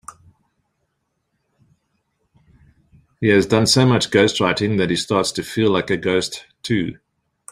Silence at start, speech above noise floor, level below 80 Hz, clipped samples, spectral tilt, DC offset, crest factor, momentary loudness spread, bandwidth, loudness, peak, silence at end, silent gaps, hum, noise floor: 0.1 s; 55 dB; -54 dBFS; under 0.1%; -4.5 dB/octave; under 0.1%; 20 dB; 8 LU; 15 kHz; -18 LUFS; -2 dBFS; 0.6 s; none; none; -72 dBFS